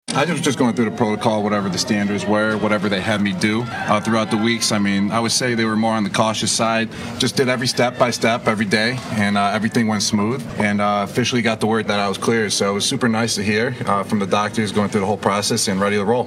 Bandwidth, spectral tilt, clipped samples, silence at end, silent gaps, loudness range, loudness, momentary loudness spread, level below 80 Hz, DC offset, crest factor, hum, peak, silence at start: 15 kHz; -4 dB/octave; under 0.1%; 0 s; none; 1 LU; -18 LUFS; 2 LU; -54 dBFS; under 0.1%; 16 dB; none; -4 dBFS; 0.1 s